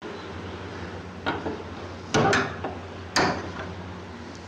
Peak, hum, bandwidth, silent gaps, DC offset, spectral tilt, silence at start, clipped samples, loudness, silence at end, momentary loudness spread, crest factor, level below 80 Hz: -12 dBFS; none; 16 kHz; none; under 0.1%; -4.5 dB/octave; 0 s; under 0.1%; -29 LUFS; 0 s; 15 LU; 16 dB; -52 dBFS